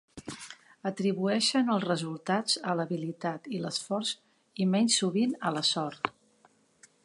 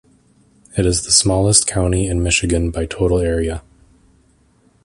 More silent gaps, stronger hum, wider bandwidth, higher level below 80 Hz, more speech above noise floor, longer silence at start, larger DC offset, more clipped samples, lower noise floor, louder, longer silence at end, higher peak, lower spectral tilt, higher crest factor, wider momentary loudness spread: neither; neither; about the same, 11.5 kHz vs 11.5 kHz; second, -74 dBFS vs -28 dBFS; about the same, 36 dB vs 39 dB; second, 0.15 s vs 0.75 s; neither; neither; first, -65 dBFS vs -55 dBFS; second, -29 LUFS vs -16 LUFS; second, 0.95 s vs 1.25 s; second, -8 dBFS vs 0 dBFS; about the same, -4 dB/octave vs -4 dB/octave; about the same, 22 dB vs 18 dB; first, 15 LU vs 9 LU